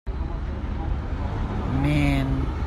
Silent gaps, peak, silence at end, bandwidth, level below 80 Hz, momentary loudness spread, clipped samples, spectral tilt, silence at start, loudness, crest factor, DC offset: none; -8 dBFS; 0 s; 12 kHz; -28 dBFS; 9 LU; under 0.1%; -7.5 dB/octave; 0.05 s; -26 LUFS; 16 dB; under 0.1%